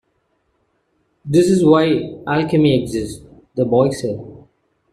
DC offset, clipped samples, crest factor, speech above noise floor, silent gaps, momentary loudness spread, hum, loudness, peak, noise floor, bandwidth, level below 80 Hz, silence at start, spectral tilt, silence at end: under 0.1%; under 0.1%; 16 dB; 50 dB; none; 17 LU; none; -16 LUFS; -2 dBFS; -66 dBFS; 13.5 kHz; -48 dBFS; 1.25 s; -6.5 dB/octave; 0.55 s